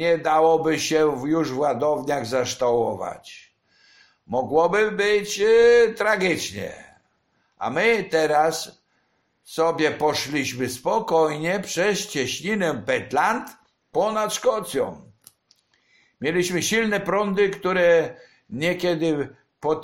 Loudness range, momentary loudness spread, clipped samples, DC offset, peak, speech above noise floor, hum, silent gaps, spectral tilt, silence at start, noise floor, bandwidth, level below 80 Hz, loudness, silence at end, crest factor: 5 LU; 11 LU; under 0.1%; under 0.1%; -6 dBFS; 47 dB; none; none; -4 dB/octave; 0 s; -68 dBFS; 16.5 kHz; -58 dBFS; -22 LUFS; 0 s; 16 dB